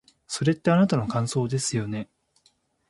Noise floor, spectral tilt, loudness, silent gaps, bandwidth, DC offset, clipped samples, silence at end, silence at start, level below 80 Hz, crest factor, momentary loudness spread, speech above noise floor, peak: -66 dBFS; -5.5 dB/octave; -25 LUFS; none; 11.5 kHz; under 0.1%; under 0.1%; 0.85 s; 0.3 s; -58 dBFS; 20 dB; 13 LU; 42 dB; -6 dBFS